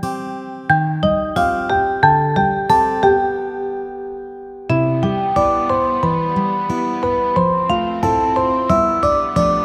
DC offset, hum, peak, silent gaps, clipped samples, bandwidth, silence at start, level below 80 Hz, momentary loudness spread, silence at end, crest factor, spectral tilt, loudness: under 0.1%; none; 0 dBFS; none; under 0.1%; 13 kHz; 0 s; -38 dBFS; 12 LU; 0 s; 16 dB; -7 dB/octave; -17 LUFS